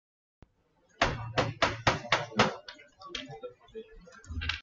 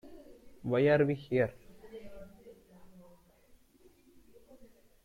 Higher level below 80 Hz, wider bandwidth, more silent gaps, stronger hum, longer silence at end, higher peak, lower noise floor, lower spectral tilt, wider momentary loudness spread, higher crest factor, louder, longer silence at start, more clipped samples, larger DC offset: first, -50 dBFS vs -64 dBFS; second, 9.2 kHz vs 15.5 kHz; neither; neither; second, 0 s vs 2.2 s; first, -10 dBFS vs -14 dBFS; first, -69 dBFS vs -63 dBFS; second, -4 dB/octave vs -8.5 dB/octave; second, 21 LU vs 26 LU; about the same, 24 dB vs 20 dB; about the same, -30 LUFS vs -30 LUFS; first, 1 s vs 0.05 s; neither; neither